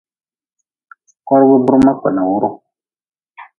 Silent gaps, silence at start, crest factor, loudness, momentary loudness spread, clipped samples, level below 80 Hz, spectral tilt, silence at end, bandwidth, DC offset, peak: 3.08-3.12 s; 1.25 s; 16 dB; -13 LUFS; 8 LU; under 0.1%; -48 dBFS; -9 dB/octave; 0.15 s; 6.8 kHz; under 0.1%; 0 dBFS